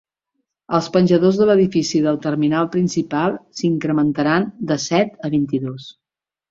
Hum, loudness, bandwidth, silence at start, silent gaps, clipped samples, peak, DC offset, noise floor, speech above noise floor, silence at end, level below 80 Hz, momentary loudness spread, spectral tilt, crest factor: none; -18 LUFS; 7.8 kHz; 0.7 s; none; under 0.1%; -2 dBFS; under 0.1%; -75 dBFS; 58 dB; 0.6 s; -56 dBFS; 8 LU; -6 dB/octave; 16 dB